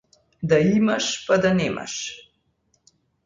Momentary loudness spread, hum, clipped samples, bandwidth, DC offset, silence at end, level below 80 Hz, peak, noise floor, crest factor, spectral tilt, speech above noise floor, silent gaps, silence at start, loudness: 14 LU; none; under 0.1%; 9.4 kHz; under 0.1%; 1.05 s; -54 dBFS; -6 dBFS; -68 dBFS; 16 dB; -5 dB/octave; 47 dB; none; 0.4 s; -21 LUFS